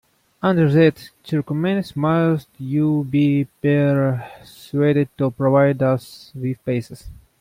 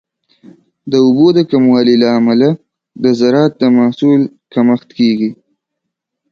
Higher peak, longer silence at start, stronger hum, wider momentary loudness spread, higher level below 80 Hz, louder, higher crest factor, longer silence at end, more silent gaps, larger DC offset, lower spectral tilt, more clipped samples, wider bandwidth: second, -4 dBFS vs 0 dBFS; second, 0.45 s vs 0.85 s; neither; first, 12 LU vs 8 LU; first, -52 dBFS vs -58 dBFS; second, -19 LUFS vs -11 LUFS; about the same, 16 dB vs 12 dB; second, 0.25 s vs 1 s; neither; neither; about the same, -8.5 dB/octave vs -7.5 dB/octave; neither; first, 15.5 kHz vs 6.8 kHz